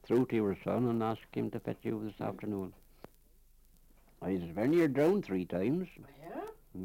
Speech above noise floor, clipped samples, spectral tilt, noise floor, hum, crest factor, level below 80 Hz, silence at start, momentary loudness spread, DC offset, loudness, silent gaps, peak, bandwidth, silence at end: 30 dB; under 0.1%; -8.5 dB/octave; -63 dBFS; none; 16 dB; -62 dBFS; 0.05 s; 16 LU; under 0.1%; -34 LUFS; none; -18 dBFS; 16.5 kHz; 0 s